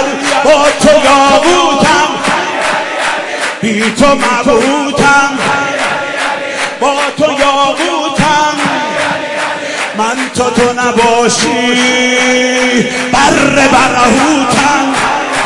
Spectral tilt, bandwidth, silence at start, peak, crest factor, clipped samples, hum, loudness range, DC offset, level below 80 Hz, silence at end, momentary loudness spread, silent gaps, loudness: -3 dB/octave; 12 kHz; 0 s; 0 dBFS; 10 dB; 0.2%; none; 3 LU; under 0.1%; -38 dBFS; 0 s; 7 LU; none; -9 LUFS